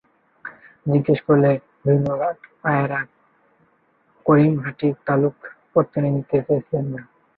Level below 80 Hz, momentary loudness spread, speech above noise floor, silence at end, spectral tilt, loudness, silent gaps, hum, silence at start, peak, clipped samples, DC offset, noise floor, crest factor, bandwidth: -60 dBFS; 18 LU; 43 dB; 0.35 s; -11.5 dB/octave; -21 LUFS; none; none; 0.45 s; -2 dBFS; under 0.1%; under 0.1%; -62 dBFS; 18 dB; 4.5 kHz